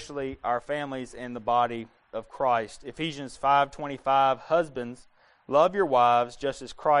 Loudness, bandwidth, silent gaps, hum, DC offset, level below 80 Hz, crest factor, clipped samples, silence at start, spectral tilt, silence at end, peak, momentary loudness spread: -26 LUFS; 10.5 kHz; none; none; under 0.1%; -58 dBFS; 18 dB; under 0.1%; 0 s; -5 dB/octave; 0 s; -10 dBFS; 15 LU